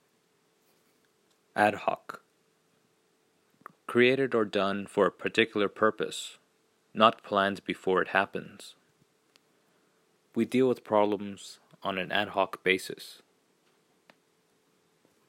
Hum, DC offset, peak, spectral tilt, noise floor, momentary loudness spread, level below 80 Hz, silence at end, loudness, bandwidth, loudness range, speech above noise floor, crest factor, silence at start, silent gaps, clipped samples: none; under 0.1%; -6 dBFS; -5 dB/octave; -70 dBFS; 19 LU; -80 dBFS; 2.15 s; -28 LUFS; 16 kHz; 6 LU; 42 dB; 26 dB; 1.55 s; none; under 0.1%